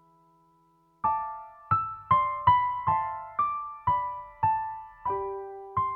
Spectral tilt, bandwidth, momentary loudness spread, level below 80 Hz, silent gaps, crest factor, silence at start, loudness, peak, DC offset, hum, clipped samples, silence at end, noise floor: -8.5 dB/octave; 4.3 kHz; 13 LU; -58 dBFS; none; 20 dB; 1.05 s; -28 LUFS; -8 dBFS; under 0.1%; none; under 0.1%; 0 s; -65 dBFS